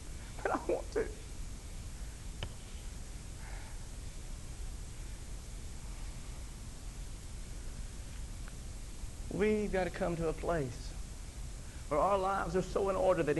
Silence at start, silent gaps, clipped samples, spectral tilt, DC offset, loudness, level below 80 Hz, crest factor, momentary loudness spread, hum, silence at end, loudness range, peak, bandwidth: 0 s; none; under 0.1%; -5.5 dB/octave; under 0.1%; -39 LUFS; -44 dBFS; 18 dB; 16 LU; none; 0 s; 12 LU; -18 dBFS; 12 kHz